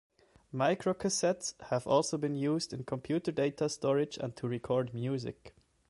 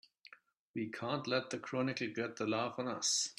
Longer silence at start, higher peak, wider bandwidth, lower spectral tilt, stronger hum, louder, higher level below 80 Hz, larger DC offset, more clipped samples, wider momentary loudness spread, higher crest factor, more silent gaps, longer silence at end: first, 0.55 s vs 0.3 s; first, -14 dBFS vs -20 dBFS; second, 11.5 kHz vs 14.5 kHz; first, -5 dB/octave vs -3 dB/octave; neither; first, -33 LUFS vs -38 LUFS; first, -66 dBFS vs -80 dBFS; neither; neither; about the same, 8 LU vs 8 LU; about the same, 18 dB vs 18 dB; second, none vs 0.59-0.74 s; first, 0.4 s vs 0.05 s